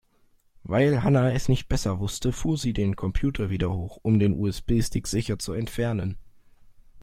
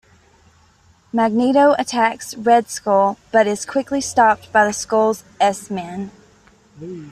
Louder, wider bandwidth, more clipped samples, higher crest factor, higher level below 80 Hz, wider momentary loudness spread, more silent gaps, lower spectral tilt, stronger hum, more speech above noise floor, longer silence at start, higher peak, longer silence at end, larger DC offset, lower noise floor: second, -26 LUFS vs -17 LUFS; first, 16 kHz vs 14.5 kHz; neither; about the same, 16 dB vs 16 dB; first, -38 dBFS vs -58 dBFS; second, 8 LU vs 14 LU; neither; first, -6.5 dB/octave vs -4 dB/octave; neither; about the same, 38 dB vs 36 dB; second, 0.65 s vs 1.15 s; second, -8 dBFS vs -2 dBFS; about the same, 0 s vs 0 s; neither; first, -62 dBFS vs -54 dBFS